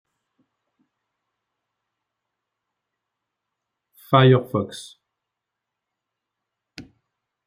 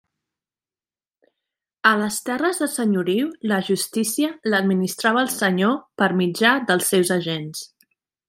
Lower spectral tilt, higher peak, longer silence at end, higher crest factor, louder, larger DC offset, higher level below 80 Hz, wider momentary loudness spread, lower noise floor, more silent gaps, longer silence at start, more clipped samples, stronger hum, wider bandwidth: first, -7 dB/octave vs -4 dB/octave; about the same, -2 dBFS vs -2 dBFS; about the same, 0.65 s vs 0.65 s; about the same, 24 dB vs 20 dB; about the same, -18 LUFS vs -20 LUFS; neither; about the same, -68 dBFS vs -70 dBFS; first, 18 LU vs 6 LU; second, -84 dBFS vs under -90 dBFS; neither; first, 4.1 s vs 1.85 s; neither; neither; about the same, 15 kHz vs 16 kHz